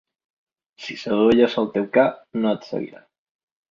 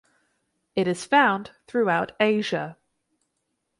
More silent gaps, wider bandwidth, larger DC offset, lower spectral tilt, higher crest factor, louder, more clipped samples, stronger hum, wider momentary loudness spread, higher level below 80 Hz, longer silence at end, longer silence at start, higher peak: neither; second, 7.4 kHz vs 11.5 kHz; neither; first, -6.5 dB/octave vs -5 dB/octave; about the same, 18 dB vs 18 dB; about the same, -21 LUFS vs -23 LUFS; neither; neither; first, 17 LU vs 11 LU; first, -60 dBFS vs -68 dBFS; second, 0.75 s vs 1.05 s; about the same, 0.8 s vs 0.75 s; first, -4 dBFS vs -8 dBFS